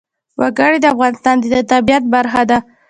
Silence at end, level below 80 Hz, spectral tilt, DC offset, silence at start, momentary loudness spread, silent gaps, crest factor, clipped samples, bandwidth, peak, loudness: 0.3 s; -46 dBFS; -4.5 dB/octave; under 0.1%; 0.4 s; 5 LU; none; 14 dB; under 0.1%; 9.4 kHz; 0 dBFS; -13 LUFS